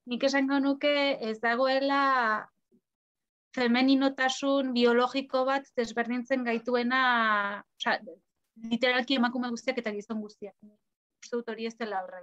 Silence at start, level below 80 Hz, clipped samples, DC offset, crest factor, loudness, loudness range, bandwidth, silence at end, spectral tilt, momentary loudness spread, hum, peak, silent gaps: 0.05 s; -76 dBFS; under 0.1%; under 0.1%; 16 dB; -28 LUFS; 4 LU; 8.2 kHz; 0 s; -3.5 dB/octave; 12 LU; none; -12 dBFS; 2.95-3.15 s, 3.29-3.51 s, 10.96-11.10 s